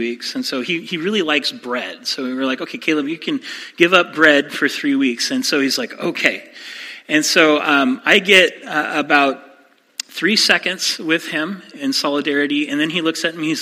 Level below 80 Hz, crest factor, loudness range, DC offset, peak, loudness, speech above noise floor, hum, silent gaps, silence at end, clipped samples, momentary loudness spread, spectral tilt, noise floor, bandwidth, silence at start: -68 dBFS; 18 dB; 4 LU; under 0.1%; 0 dBFS; -16 LUFS; 33 dB; none; none; 0 s; under 0.1%; 12 LU; -2.5 dB/octave; -50 dBFS; 16 kHz; 0 s